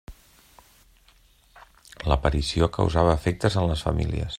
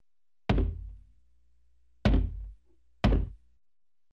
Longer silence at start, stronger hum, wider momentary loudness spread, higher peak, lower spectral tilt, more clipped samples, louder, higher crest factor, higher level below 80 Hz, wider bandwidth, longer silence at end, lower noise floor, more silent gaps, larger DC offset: second, 0.1 s vs 0.5 s; neither; second, 5 LU vs 18 LU; first, -6 dBFS vs -10 dBFS; second, -6.5 dB/octave vs -8 dB/octave; neither; first, -24 LUFS vs -31 LUFS; about the same, 20 dB vs 22 dB; about the same, -34 dBFS vs -34 dBFS; first, 13 kHz vs 6.6 kHz; second, 0 s vs 0.75 s; second, -58 dBFS vs -85 dBFS; neither; neither